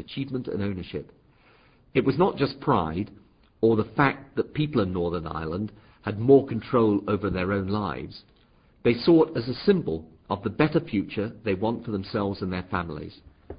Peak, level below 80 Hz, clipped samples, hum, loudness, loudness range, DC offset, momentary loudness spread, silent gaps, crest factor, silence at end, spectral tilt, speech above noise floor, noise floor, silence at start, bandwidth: -4 dBFS; -48 dBFS; under 0.1%; none; -26 LUFS; 3 LU; under 0.1%; 14 LU; none; 22 dB; 0 s; -11.5 dB/octave; 34 dB; -59 dBFS; 0 s; 5.2 kHz